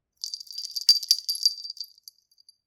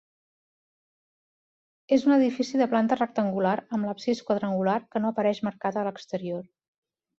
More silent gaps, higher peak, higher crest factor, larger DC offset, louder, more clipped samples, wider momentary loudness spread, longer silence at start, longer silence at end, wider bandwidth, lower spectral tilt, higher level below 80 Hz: neither; first, -2 dBFS vs -10 dBFS; first, 26 dB vs 18 dB; neither; first, -22 LUFS vs -26 LUFS; neither; first, 17 LU vs 10 LU; second, 0.25 s vs 1.9 s; about the same, 0.8 s vs 0.75 s; first, 19 kHz vs 7.6 kHz; second, 4.5 dB/octave vs -6.5 dB/octave; second, -80 dBFS vs -72 dBFS